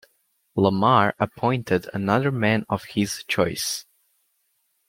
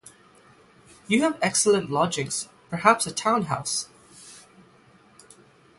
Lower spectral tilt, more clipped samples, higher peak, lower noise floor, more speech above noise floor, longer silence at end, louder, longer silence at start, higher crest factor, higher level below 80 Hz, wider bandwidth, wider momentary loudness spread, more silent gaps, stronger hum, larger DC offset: first, -5 dB/octave vs -3.5 dB/octave; neither; about the same, -2 dBFS vs -2 dBFS; first, -70 dBFS vs -56 dBFS; first, 48 dB vs 32 dB; second, 1.05 s vs 1.4 s; about the same, -23 LUFS vs -23 LUFS; second, 0.55 s vs 1.1 s; about the same, 22 dB vs 24 dB; first, -58 dBFS vs -64 dBFS; first, 16.5 kHz vs 12 kHz; second, 9 LU vs 18 LU; neither; neither; neither